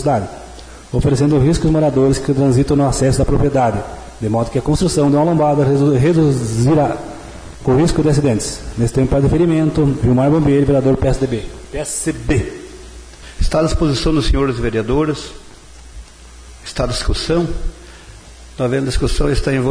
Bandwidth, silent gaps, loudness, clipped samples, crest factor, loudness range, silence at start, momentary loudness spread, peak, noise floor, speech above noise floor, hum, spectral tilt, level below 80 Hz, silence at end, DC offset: 11 kHz; none; -16 LUFS; under 0.1%; 10 dB; 6 LU; 0 s; 15 LU; -4 dBFS; -38 dBFS; 24 dB; none; -6.5 dB/octave; -26 dBFS; 0 s; under 0.1%